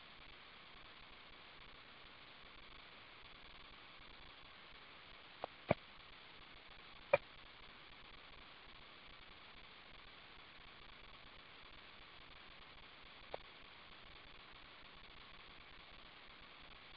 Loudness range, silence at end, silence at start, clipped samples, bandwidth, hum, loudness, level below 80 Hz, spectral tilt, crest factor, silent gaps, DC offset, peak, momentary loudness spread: 12 LU; 0 s; 0 s; under 0.1%; 5.4 kHz; none; -52 LUFS; -70 dBFS; -2.5 dB/octave; 38 dB; none; under 0.1%; -14 dBFS; 6 LU